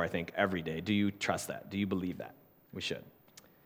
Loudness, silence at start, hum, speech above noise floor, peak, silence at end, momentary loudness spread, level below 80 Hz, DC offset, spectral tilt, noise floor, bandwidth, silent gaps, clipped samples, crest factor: -35 LUFS; 0 s; none; 25 dB; -14 dBFS; 0.25 s; 13 LU; -66 dBFS; under 0.1%; -5 dB/octave; -60 dBFS; 19 kHz; none; under 0.1%; 22 dB